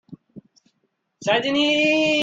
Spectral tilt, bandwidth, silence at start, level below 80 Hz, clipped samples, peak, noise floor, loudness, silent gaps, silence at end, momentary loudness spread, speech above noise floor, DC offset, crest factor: -3.5 dB/octave; 8 kHz; 0.1 s; -64 dBFS; under 0.1%; -6 dBFS; -72 dBFS; -19 LUFS; none; 0 s; 6 LU; 53 dB; under 0.1%; 16 dB